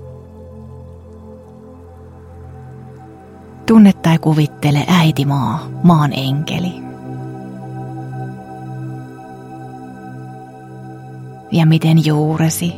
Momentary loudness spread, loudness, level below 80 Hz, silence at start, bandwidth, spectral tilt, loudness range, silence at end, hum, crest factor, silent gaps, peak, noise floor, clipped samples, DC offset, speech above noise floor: 24 LU; -14 LUFS; -48 dBFS; 0 s; 15.5 kHz; -6.5 dB/octave; 18 LU; 0 s; none; 18 dB; none; 0 dBFS; -37 dBFS; under 0.1%; under 0.1%; 25 dB